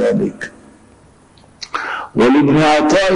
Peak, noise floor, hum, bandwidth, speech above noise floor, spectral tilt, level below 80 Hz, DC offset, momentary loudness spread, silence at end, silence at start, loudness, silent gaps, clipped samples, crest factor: -6 dBFS; -47 dBFS; none; 10 kHz; 34 dB; -5.5 dB/octave; -44 dBFS; under 0.1%; 19 LU; 0 s; 0 s; -14 LUFS; none; under 0.1%; 10 dB